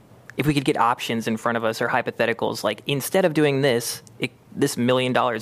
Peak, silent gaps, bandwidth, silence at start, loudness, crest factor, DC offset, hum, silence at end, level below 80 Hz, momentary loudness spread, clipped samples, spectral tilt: -4 dBFS; none; 15.5 kHz; 0.35 s; -22 LUFS; 18 dB; under 0.1%; none; 0 s; -56 dBFS; 10 LU; under 0.1%; -5 dB/octave